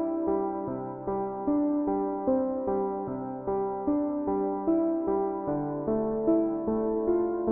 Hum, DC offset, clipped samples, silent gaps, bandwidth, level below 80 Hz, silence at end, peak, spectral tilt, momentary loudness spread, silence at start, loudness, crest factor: none; under 0.1%; under 0.1%; none; 2.5 kHz; -56 dBFS; 0 s; -14 dBFS; -6.5 dB/octave; 6 LU; 0 s; -29 LUFS; 14 dB